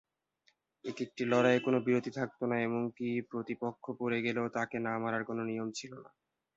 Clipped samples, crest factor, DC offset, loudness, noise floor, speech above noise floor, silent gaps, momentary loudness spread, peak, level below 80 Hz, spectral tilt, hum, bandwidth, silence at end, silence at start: under 0.1%; 22 dB; under 0.1%; -34 LUFS; -75 dBFS; 41 dB; none; 12 LU; -14 dBFS; -76 dBFS; -6 dB/octave; none; 7.8 kHz; 0.55 s; 0.85 s